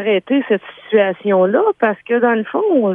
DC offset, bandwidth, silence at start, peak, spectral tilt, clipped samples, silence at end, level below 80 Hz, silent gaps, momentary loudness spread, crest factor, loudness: under 0.1%; 3.7 kHz; 0 s; -2 dBFS; -9 dB/octave; under 0.1%; 0 s; -68 dBFS; none; 4 LU; 14 dB; -16 LUFS